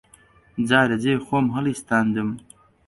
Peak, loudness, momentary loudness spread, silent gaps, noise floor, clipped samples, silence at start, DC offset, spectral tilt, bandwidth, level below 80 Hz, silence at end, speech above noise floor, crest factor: -2 dBFS; -22 LUFS; 11 LU; none; -54 dBFS; under 0.1%; 0.55 s; under 0.1%; -6 dB/octave; 11.5 kHz; -56 dBFS; 0.5 s; 33 dB; 20 dB